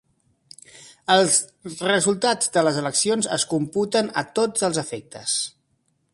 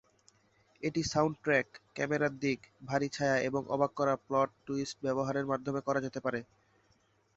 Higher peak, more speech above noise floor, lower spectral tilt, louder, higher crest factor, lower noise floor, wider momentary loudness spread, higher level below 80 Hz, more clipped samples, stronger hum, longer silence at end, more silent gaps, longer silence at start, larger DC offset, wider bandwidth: first, -4 dBFS vs -14 dBFS; first, 47 dB vs 38 dB; second, -2.5 dB/octave vs -5.5 dB/octave; first, -21 LUFS vs -33 LUFS; about the same, 20 dB vs 20 dB; about the same, -69 dBFS vs -71 dBFS; first, 12 LU vs 7 LU; about the same, -66 dBFS vs -66 dBFS; neither; neither; second, 0.65 s vs 0.95 s; neither; about the same, 0.75 s vs 0.8 s; neither; first, 11.5 kHz vs 8.2 kHz